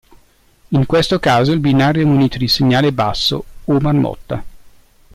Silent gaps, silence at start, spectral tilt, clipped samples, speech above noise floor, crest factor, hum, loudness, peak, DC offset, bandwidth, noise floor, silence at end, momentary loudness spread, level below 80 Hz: none; 0.7 s; -6.5 dB/octave; under 0.1%; 37 dB; 12 dB; none; -15 LUFS; -4 dBFS; under 0.1%; 15 kHz; -51 dBFS; 0.6 s; 8 LU; -38 dBFS